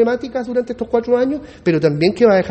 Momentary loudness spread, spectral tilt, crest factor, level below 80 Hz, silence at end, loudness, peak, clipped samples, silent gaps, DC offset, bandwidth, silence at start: 8 LU; -7.5 dB/octave; 16 dB; -48 dBFS; 0 s; -17 LUFS; 0 dBFS; under 0.1%; none; under 0.1%; 8.6 kHz; 0 s